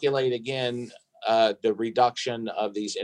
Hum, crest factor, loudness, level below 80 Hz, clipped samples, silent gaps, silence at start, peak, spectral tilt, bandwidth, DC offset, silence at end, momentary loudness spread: none; 18 dB; -26 LUFS; -78 dBFS; under 0.1%; none; 0 s; -8 dBFS; -4.5 dB/octave; 10.5 kHz; under 0.1%; 0 s; 9 LU